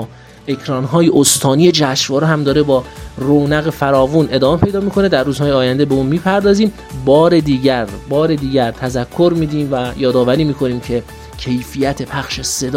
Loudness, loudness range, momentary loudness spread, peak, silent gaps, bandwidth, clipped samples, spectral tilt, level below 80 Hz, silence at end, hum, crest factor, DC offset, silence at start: -14 LUFS; 4 LU; 10 LU; 0 dBFS; none; 16.5 kHz; under 0.1%; -5 dB/octave; -36 dBFS; 0 s; none; 14 dB; under 0.1%; 0 s